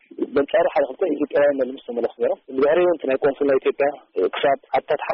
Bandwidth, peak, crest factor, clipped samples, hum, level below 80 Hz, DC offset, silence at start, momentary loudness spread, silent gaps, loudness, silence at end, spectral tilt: 5.4 kHz; -10 dBFS; 12 dB; under 0.1%; none; -60 dBFS; under 0.1%; 0.2 s; 6 LU; none; -21 LUFS; 0 s; -3 dB/octave